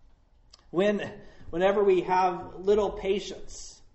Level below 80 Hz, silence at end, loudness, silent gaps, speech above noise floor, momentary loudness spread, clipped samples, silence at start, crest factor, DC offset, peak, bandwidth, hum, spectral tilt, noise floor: -50 dBFS; 0.2 s; -27 LUFS; none; 32 dB; 16 LU; under 0.1%; 0.75 s; 16 dB; under 0.1%; -12 dBFS; 8.2 kHz; none; -5.5 dB/octave; -58 dBFS